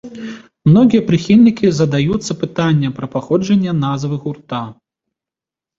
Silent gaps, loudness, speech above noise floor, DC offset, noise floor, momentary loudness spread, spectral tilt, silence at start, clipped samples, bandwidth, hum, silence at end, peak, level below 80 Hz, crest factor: none; -15 LUFS; 74 dB; under 0.1%; -88 dBFS; 15 LU; -7 dB/octave; 0.05 s; under 0.1%; 7.8 kHz; none; 1.05 s; -2 dBFS; -48 dBFS; 14 dB